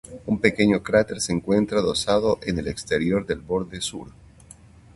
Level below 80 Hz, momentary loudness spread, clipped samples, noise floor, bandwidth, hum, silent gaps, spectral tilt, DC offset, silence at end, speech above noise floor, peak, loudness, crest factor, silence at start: -46 dBFS; 9 LU; under 0.1%; -48 dBFS; 11.5 kHz; none; none; -5 dB/octave; under 0.1%; 0.85 s; 26 dB; -2 dBFS; -23 LUFS; 22 dB; 0.1 s